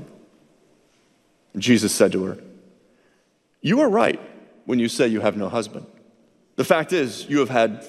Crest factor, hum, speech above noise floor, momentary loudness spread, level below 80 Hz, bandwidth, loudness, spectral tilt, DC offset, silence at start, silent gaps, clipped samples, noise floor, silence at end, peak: 20 dB; none; 44 dB; 16 LU; -66 dBFS; 15 kHz; -21 LUFS; -4.5 dB/octave; under 0.1%; 0 s; none; under 0.1%; -64 dBFS; 0 s; -2 dBFS